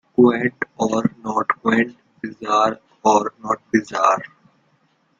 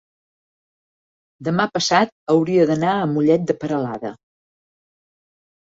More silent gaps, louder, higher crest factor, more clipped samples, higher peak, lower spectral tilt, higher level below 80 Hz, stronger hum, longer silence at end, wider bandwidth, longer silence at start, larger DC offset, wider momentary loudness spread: second, none vs 2.12-2.27 s; about the same, -20 LUFS vs -19 LUFS; about the same, 18 dB vs 18 dB; neither; about the same, -2 dBFS vs -4 dBFS; about the same, -5.5 dB/octave vs -5.5 dB/octave; about the same, -62 dBFS vs -62 dBFS; neither; second, 0.95 s vs 1.65 s; about the same, 7.6 kHz vs 7.8 kHz; second, 0.2 s vs 1.4 s; neither; about the same, 9 LU vs 10 LU